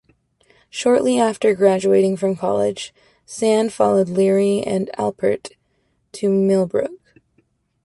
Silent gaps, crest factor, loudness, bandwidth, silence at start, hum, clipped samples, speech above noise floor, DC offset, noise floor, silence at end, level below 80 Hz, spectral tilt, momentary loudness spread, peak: none; 16 dB; -18 LUFS; 11.5 kHz; 0.75 s; none; under 0.1%; 48 dB; under 0.1%; -66 dBFS; 0.9 s; -60 dBFS; -6 dB/octave; 14 LU; -2 dBFS